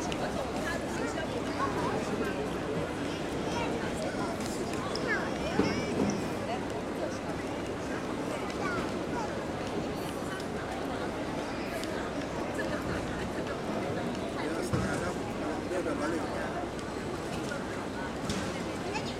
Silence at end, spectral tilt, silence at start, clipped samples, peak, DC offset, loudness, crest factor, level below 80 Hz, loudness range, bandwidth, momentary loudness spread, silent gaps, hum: 0 s; -5 dB/octave; 0 s; under 0.1%; -12 dBFS; under 0.1%; -34 LUFS; 22 dB; -50 dBFS; 2 LU; 16 kHz; 4 LU; none; none